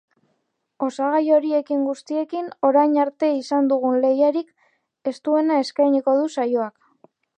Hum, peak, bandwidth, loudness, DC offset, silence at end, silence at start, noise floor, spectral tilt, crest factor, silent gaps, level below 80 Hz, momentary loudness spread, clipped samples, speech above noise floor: none; -6 dBFS; 9.4 kHz; -21 LUFS; under 0.1%; 0.7 s; 0.8 s; -72 dBFS; -5 dB/octave; 16 dB; none; -82 dBFS; 10 LU; under 0.1%; 53 dB